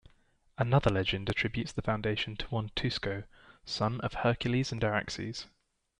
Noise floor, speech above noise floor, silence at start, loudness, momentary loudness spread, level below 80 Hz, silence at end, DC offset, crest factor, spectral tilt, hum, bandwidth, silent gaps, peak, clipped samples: -66 dBFS; 35 dB; 0.6 s; -32 LUFS; 12 LU; -50 dBFS; 0.55 s; under 0.1%; 20 dB; -6 dB/octave; none; 10.5 kHz; none; -14 dBFS; under 0.1%